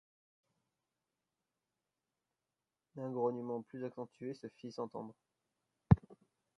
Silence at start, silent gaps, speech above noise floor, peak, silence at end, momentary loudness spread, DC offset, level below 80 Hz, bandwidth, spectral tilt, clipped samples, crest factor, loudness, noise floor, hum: 2.95 s; none; over 48 dB; -10 dBFS; 0.45 s; 17 LU; under 0.1%; -54 dBFS; 6.6 kHz; -10 dB/octave; under 0.1%; 30 dB; -38 LUFS; under -90 dBFS; none